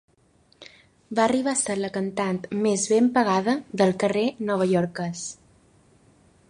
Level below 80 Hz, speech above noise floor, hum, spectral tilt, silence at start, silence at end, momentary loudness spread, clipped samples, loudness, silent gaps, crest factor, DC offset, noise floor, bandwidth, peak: -64 dBFS; 38 dB; none; -5 dB/octave; 0.6 s; 1.15 s; 9 LU; under 0.1%; -24 LUFS; none; 18 dB; under 0.1%; -61 dBFS; 11.5 kHz; -6 dBFS